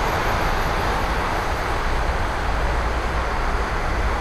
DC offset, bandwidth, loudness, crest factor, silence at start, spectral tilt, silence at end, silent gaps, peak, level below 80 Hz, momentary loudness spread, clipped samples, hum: under 0.1%; 14 kHz; -23 LUFS; 12 dB; 0 s; -5 dB/octave; 0 s; none; -10 dBFS; -24 dBFS; 2 LU; under 0.1%; none